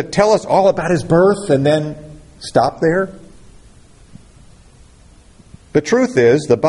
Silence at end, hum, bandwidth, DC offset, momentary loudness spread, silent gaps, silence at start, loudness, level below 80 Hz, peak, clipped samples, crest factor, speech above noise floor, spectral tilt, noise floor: 0 s; none; 11.5 kHz; under 0.1%; 8 LU; none; 0 s; -15 LUFS; -46 dBFS; 0 dBFS; under 0.1%; 16 dB; 31 dB; -6 dB/octave; -45 dBFS